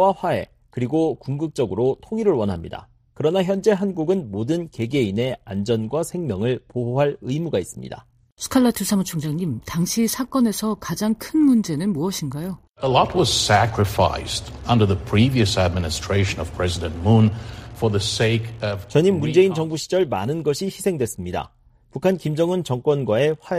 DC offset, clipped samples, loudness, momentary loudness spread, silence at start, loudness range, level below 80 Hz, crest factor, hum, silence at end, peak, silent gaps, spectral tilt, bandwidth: under 0.1%; under 0.1%; -21 LUFS; 10 LU; 0 s; 4 LU; -44 dBFS; 18 dB; none; 0 s; -4 dBFS; 8.32-8.36 s; -5.5 dB/octave; 15.5 kHz